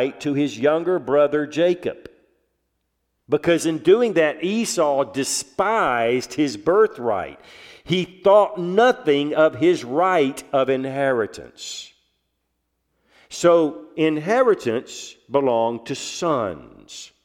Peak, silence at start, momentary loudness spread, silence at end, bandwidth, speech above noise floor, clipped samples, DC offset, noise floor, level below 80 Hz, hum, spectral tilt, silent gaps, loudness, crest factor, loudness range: -4 dBFS; 0 s; 14 LU; 0.2 s; 16 kHz; 54 dB; under 0.1%; under 0.1%; -74 dBFS; -62 dBFS; none; -4.5 dB/octave; none; -20 LUFS; 18 dB; 5 LU